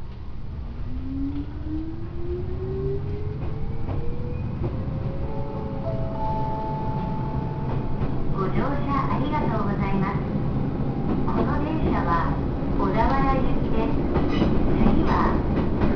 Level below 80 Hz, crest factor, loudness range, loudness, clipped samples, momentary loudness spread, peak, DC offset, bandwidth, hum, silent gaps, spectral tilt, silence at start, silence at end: -30 dBFS; 16 dB; 7 LU; -26 LUFS; under 0.1%; 10 LU; -6 dBFS; under 0.1%; 5.4 kHz; none; none; -9.5 dB/octave; 0 s; 0 s